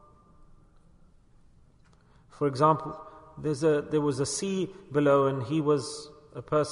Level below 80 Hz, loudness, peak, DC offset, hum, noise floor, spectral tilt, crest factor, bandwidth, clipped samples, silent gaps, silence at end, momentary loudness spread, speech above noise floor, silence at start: -60 dBFS; -27 LUFS; -10 dBFS; under 0.1%; none; -59 dBFS; -6 dB/octave; 20 dB; 11 kHz; under 0.1%; none; 0 s; 17 LU; 32 dB; 2.35 s